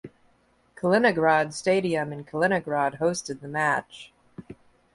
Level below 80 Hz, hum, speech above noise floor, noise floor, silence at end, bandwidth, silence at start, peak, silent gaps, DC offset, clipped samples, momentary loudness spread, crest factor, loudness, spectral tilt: -64 dBFS; none; 39 dB; -64 dBFS; 0.4 s; 11.5 kHz; 0.05 s; -6 dBFS; none; under 0.1%; under 0.1%; 24 LU; 20 dB; -25 LUFS; -5 dB/octave